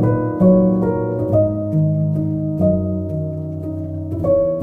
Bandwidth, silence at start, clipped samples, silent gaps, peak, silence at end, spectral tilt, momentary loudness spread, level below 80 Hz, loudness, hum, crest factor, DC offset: 2.5 kHz; 0 s; under 0.1%; none; -4 dBFS; 0 s; -12.5 dB/octave; 12 LU; -40 dBFS; -18 LUFS; none; 14 dB; under 0.1%